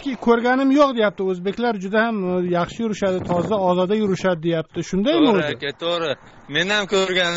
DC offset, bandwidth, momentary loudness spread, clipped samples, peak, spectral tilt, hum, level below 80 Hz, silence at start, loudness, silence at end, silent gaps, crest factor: under 0.1%; 8 kHz; 8 LU; under 0.1%; -4 dBFS; -3.5 dB/octave; none; -52 dBFS; 0 s; -20 LUFS; 0 s; none; 16 dB